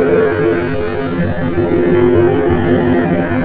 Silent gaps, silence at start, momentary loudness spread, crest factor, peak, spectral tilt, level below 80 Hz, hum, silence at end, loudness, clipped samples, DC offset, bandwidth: none; 0 s; 6 LU; 12 dB; -2 dBFS; -11.5 dB/octave; -32 dBFS; none; 0 s; -13 LUFS; under 0.1%; 2%; 4.7 kHz